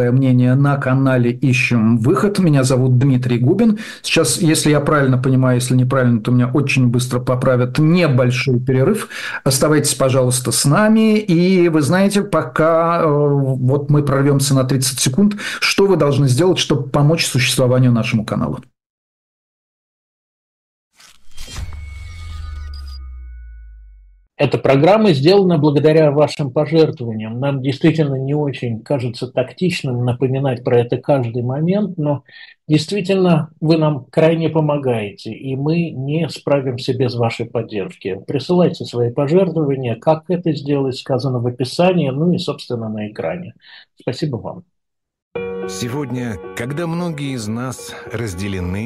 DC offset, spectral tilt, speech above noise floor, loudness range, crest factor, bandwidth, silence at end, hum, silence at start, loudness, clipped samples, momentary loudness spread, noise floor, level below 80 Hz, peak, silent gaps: under 0.1%; -6 dB/octave; 60 dB; 11 LU; 14 dB; 12.5 kHz; 0 s; none; 0 s; -16 LUFS; under 0.1%; 12 LU; -76 dBFS; -42 dBFS; -2 dBFS; 18.86-20.91 s, 45.22-45.31 s